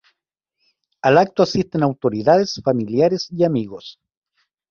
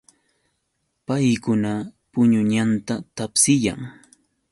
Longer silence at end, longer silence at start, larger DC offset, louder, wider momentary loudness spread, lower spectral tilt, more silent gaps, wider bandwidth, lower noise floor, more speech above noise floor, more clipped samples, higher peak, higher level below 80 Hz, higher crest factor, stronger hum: first, 0.8 s vs 0.6 s; about the same, 1.05 s vs 1.1 s; neither; first, -18 LUFS vs -21 LUFS; second, 9 LU vs 13 LU; first, -6.5 dB/octave vs -4.5 dB/octave; neither; second, 7.2 kHz vs 11.5 kHz; first, -78 dBFS vs -74 dBFS; first, 61 dB vs 53 dB; neither; about the same, -2 dBFS vs -4 dBFS; about the same, -56 dBFS vs -56 dBFS; about the same, 18 dB vs 18 dB; neither